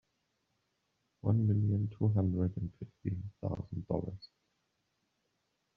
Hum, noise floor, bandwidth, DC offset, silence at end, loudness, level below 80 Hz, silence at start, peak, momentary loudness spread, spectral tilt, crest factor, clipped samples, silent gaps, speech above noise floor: none; -81 dBFS; 4.7 kHz; under 0.1%; 1.5 s; -35 LUFS; -62 dBFS; 1.25 s; -16 dBFS; 12 LU; -11 dB/octave; 20 dB; under 0.1%; none; 48 dB